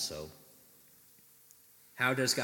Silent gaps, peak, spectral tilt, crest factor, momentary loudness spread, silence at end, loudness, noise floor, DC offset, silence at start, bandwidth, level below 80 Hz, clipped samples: none; -14 dBFS; -2.5 dB/octave; 22 dB; 28 LU; 0 s; -32 LUFS; -61 dBFS; under 0.1%; 0 s; 17.5 kHz; -70 dBFS; under 0.1%